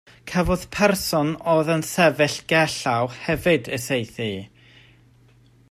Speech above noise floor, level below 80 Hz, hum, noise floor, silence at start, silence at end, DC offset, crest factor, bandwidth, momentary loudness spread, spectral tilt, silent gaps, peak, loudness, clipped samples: 33 dB; -44 dBFS; none; -54 dBFS; 0.25 s; 1.25 s; under 0.1%; 18 dB; 15.5 kHz; 8 LU; -4.5 dB/octave; none; -4 dBFS; -22 LUFS; under 0.1%